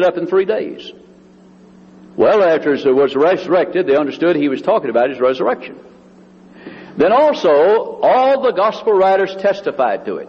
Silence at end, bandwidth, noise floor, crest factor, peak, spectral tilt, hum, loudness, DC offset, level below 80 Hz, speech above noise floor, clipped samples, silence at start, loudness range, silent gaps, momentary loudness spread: 0 s; 7 kHz; -44 dBFS; 12 dB; -2 dBFS; -6.5 dB/octave; none; -14 LUFS; under 0.1%; -60 dBFS; 30 dB; under 0.1%; 0 s; 3 LU; none; 9 LU